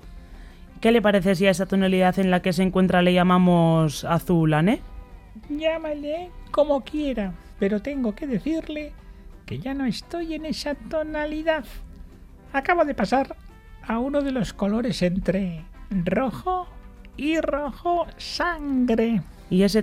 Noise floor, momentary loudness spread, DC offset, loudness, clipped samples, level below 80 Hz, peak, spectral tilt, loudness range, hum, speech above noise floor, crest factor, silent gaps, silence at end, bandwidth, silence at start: -45 dBFS; 12 LU; under 0.1%; -23 LUFS; under 0.1%; -42 dBFS; -6 dBFS; -6.5 dB/octave; 9 LU; none; 22 dB; 18 dB; none; 0 s; 15 kHz; 0.05 s